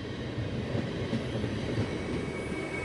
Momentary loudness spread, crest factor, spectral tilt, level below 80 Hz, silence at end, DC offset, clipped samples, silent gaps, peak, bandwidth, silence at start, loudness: 2 LU; 16 dB; -6.5 dB/octave; -48 dBFS; 0 s; under 0.1%; under 0.1%; none; -18 dBFS; 11.5 kHz; 0 s; -34 LUFS